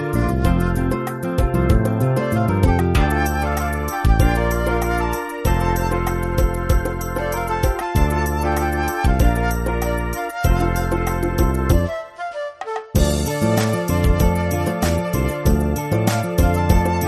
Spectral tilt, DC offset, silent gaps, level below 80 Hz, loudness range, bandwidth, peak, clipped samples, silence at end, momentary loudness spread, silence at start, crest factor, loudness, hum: -6.5 dB/octave; under 0.1%; none; -22 dBFS; 2 LU; 13.5 kHz; -2 dBFS; under 0.1%; 0 s; 5 LU; 0 s; 16 dB; -20 LUFS; none